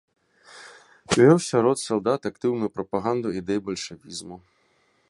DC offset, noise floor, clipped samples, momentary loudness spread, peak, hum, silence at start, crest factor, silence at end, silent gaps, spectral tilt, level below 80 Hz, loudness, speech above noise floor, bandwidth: under 0.1%; -65 dBFS; under 0.1%; 20 LU; -4 dBFS; none; 0.55 s; 20 dB; 0.7 s; none; -5.5 dB/octave; -60 dBFS; -23 LUFS; 42 dB; 11.5 kHz